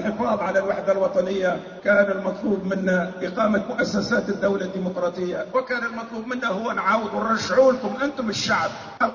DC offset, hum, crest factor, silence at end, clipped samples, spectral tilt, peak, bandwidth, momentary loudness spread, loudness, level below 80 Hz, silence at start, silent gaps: under 0.1%; none; 16 dB; 0 s; under 0.1%; -5 dB/octave; -6 dBFS; 7.4 kHz; 7 LU; -23 LUFS; -56 dBFS; 0 s; none